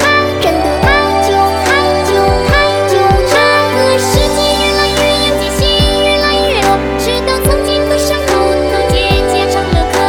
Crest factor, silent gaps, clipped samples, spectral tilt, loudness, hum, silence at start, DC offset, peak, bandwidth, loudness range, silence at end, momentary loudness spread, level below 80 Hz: 10 dB; none; under 0.1%; -4 dB/octave; -10 LUFS; none; 0 s; 0.2%; 0 dBFS; 20 kHz; 2 LU; 0 s; 3 LU; -22 dBFS